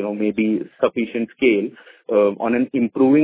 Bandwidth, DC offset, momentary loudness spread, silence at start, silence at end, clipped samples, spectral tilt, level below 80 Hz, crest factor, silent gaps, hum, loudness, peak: 4 kHz; under 0.1%; 6 LU; 0 s; 0 s; under 0.1%; -10.5 dB/octave; -60 dBFS; 16 dB; none; none; -20 LUFS; -4 dBFS